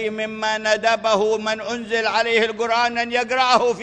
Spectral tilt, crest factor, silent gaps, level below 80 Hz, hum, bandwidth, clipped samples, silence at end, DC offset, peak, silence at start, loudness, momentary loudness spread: -2.5 dB/octave; 16 dB; none; -60 dBFS; none; 9.8 kHz; under 0.1%; 0 s; under 0.1%; -4 dBFS; 0 s; -19 LUFS; 7 LU